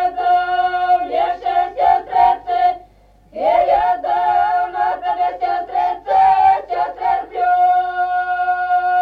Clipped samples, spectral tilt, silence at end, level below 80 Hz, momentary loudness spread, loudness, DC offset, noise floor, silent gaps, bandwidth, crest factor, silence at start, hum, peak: under 0.1%; -5 dB/octave; 0 s; -50 dBFS; 6 LU; -16 LUFS; under 0.1%; -48 dBFS; none; 5.2 kHz; 14 dB; 0 s; none; -2 dBFS